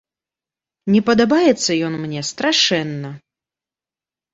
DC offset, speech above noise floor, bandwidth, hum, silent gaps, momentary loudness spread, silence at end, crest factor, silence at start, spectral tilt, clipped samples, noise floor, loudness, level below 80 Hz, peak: under 0.1%; over 73 dB; 8 kHz; none; none; 14 LU; 1.15 s; 18 dB; 0.85 s; -4 dB/octave; under 0.1%; under -90 dBFS; -17 LUFS; -58 dBFS; -2 dBFS